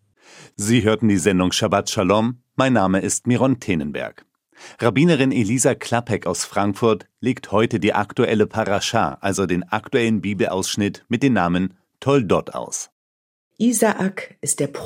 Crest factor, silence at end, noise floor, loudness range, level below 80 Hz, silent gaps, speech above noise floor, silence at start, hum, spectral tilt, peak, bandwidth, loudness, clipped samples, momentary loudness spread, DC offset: 18 dB; 0 s; -47 dBFS; 3 LU; -58 dBFS; 12.92-13.51 s; 28 dB; 0.35 s; none; -5 dB/octave; -2 dBFS; 16 kHz; -20 LUFS; under 0.1%; 8 LU; under 0.1%